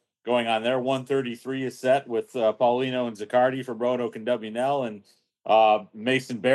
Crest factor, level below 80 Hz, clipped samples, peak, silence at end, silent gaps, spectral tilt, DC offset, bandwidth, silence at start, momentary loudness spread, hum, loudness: 18 dB; -88 dBFS; under 0.1%; -6 dBFS; 0 s; none; -5.5 dB/octave; under 0.1%; 12.5 kHz; 0.25 s; 8 LU; none; -25 LUFS